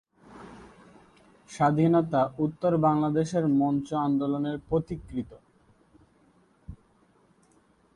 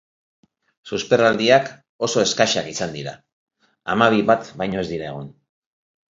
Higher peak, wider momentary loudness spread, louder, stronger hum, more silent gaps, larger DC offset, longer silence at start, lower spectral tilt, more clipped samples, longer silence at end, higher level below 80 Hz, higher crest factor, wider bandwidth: second, -10 dBFS vs 0 dBFS; first, 22 LU vs 17 LU; second, -26 LUFS vs -19 LUFS; neither; second, none vs 1.89-1.99 s, 3.33-3.47 s; neither; second, 0.3 s vs 0.85 s; first, -8 dB/octave vs -4 dB/octave; neither; first, 1.2 s vs 0.85 s; about the same, -56 dBFS vs -56 dBFS; about the same, 18 dB vs 22 dB; first, 10.5 kHz vs 7.8 kHz